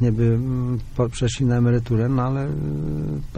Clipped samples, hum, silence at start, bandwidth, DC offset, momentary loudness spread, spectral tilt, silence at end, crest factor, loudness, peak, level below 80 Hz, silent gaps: under 0.1%; none; 0 s; 9.6 kHz; under 0.1%; 7 LU; -7.5 dB/octave; 0 s; 12 dB; -22 LUFS; -8 dBFS; -36 dBFS; none